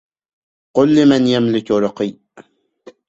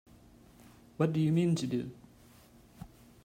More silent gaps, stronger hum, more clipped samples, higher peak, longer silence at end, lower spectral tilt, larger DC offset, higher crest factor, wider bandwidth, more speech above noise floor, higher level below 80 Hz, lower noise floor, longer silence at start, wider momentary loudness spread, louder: neither; neither; neither; first, -2 dBFS vs -16 dBFS; first, 0.65 s vs 0.4 s; about the same, -6.5 dB/octave vs -7.5 dB/octave; neither; about the same, 16 dB vs 18 dB; second, 8 kHz vs 15.5 kHz; first, 33 dB vs 29 dB; first, -56 dBFS vs -64 dBFS; second, -46 dBFS vs -59 dBFS; second, 0.75 s vs 1 s; second, 11 LU vs 24 LU; first, -15 LUFS vs -31 LUFS